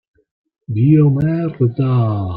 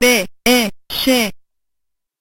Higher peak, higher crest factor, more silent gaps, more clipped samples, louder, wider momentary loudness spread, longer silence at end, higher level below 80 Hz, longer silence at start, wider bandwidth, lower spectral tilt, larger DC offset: about the same, -2 dBFS vs -2 dBFS; about the same, 14 dB vs 16 dB; neither; neither; about the same, -15 LUFS vs -16 LUFS; about the same, 7 LU vs 7 LU; second, 0 s vs 0.85 s; second, -50 dBFS vs -44 dBFS; first, 0.7 s vs 0 s; second, 4.6 kHz vs 16 kHz; first, -12 dB/octave vs -2 dB/octave; neither